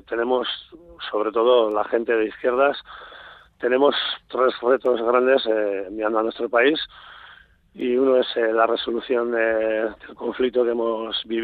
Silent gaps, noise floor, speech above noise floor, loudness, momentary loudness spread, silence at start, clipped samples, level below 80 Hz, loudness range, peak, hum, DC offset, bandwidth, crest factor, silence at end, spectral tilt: none; -49 dBFS; 28 dB; -21 LUFS; 11 LU; 0.1 s; under 0.1%; -60 dBFS; 1 LU; -4 dBFS; none; under 0.1%; 4.7 kHz; 18 dB; 0 s; -6.5 dB/octave